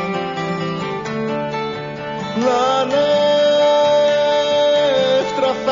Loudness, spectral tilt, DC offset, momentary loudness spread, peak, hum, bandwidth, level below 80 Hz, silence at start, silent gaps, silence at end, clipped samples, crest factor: -17 LUFS; -3 dB/octave; under 0.1%; 10 LU; -6 dBFS; none; 7.4 kHz; -54 dBFS; 0 s; none; 0 s; under 0.1%; 12 dB